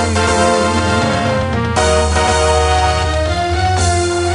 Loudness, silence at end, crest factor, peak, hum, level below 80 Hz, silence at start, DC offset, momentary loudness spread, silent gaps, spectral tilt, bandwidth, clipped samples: -14 LUFS; 0 s; 14 dB; 0 dBFS; none; -24 dBFS; 0 s; under 0.1%; 4 LU; none; -4.5 dB/octave; 11 kHz; under 0.1%